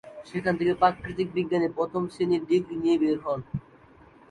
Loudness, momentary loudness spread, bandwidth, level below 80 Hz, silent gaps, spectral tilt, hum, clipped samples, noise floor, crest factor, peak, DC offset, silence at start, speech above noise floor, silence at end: -26 LUFS; 8 LU; 10 kHz; -56 dBFS; none; -7.5 dB/octave; none; under 0.1%; -54 dBFS; 20 dB; -8 dBFS; under 0.1%; 0.05 s; 28 dB; 0.7 s